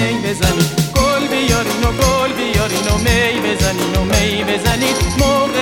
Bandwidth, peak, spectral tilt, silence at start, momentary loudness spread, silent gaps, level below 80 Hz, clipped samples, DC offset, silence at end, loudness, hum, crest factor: 17.5 kHz; 0 dBFS; -4 dB/octave; 0 s; 2 LU; none; -24 dBFS; under 0.1%; 0.2%; 0 s; -15 LUFS; none; 14 dB